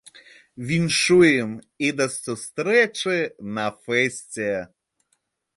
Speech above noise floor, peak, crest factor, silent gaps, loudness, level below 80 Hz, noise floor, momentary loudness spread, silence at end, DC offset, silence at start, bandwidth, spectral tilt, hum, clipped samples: 50 dB; -4 dBFS; 18 dB; none; -22 LUFS; -60 dBFS; -72 dBFS; 14 LU; 0.9 s; under 0.1%; 0.6 s; 11.5 kHz; -4 dB/octave; none; under 0.1%